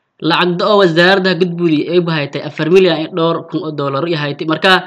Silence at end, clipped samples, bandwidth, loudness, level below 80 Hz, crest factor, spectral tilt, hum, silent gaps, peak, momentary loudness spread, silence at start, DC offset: 0 s; under 0.1%; 10.5 kHz; -13 LUFS; -60 dBFS; 14 dB; -6.5 dB/octave; none; none; 0 dBFS; 9 LU; 0.2 s; under 0.1%